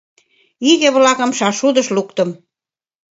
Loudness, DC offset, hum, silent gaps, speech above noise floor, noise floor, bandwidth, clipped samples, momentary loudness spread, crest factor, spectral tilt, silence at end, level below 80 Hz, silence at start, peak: -15 LUFS; under 0.1%; none; none; over 76 dB; under -90 dBFS; 8 kHz; under 0.1%; 9 LU; 16 dB; -3 dB/octave; 0.8 s; -68 dBFS; 0.6 s; 0 dBFS